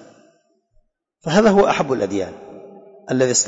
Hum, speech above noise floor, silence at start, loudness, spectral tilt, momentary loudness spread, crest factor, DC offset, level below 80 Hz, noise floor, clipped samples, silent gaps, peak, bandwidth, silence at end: none; 44 dB; 1.25 s; -17 LUFS; -4 dB/octave; 19 LU; 16 dB; under 0.1%; -50 dBFS; -60 dBFS; under 0.1%; none; -4 dBFS; 8 kHz; 0 s